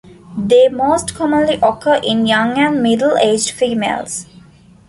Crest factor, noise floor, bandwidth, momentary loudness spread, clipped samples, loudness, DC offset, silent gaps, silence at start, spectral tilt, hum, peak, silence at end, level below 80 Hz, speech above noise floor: 14 dB; -44 dBFS; 11.5 kHz; 10 LU; under 0.1%; -14 LUFS; under 0.1%; none; 0.3 s; -4 dB/octave; none; 0 dBFS; 0.65 s; -48 dBFS; 30 dB